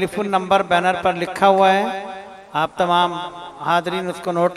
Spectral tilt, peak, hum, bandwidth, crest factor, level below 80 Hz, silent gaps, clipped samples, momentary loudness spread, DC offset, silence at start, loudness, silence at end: -5 dB/octave; 0 dBFS; none; 13.5 kHz; 18 dB; -58 dBFS; none; under 0.1%; 14 LU; under 0.1%; 0 s; -19 LUFS; 0 s